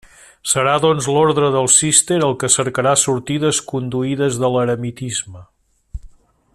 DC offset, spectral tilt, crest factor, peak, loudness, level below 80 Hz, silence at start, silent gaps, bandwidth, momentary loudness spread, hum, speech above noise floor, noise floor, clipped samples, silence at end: under 0.1%; -3.5 dB/octave; 18 dB; 0 dBFS; -16 LUFS; -46 dBFS; 0.45 s; none; 14 kHz; 11 LU; none; 27 dB; -43 dBFS; under 0.1%; 0.45 s